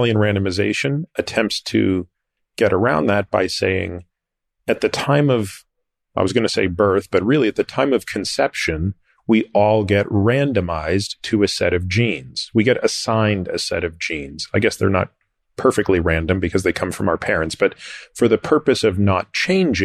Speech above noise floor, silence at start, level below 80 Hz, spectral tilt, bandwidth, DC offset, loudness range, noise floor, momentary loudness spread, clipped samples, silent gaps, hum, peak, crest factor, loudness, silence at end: 60 dB; 0 s; -42 dBFS; -5.5 dB/octave; 13.5 kHz; under 0.1%; 2 LU; -79 dBFS; 8 LU; under 0.1%; none; none; -4 dBFS; 16 dB; -19 LUFS; 0 s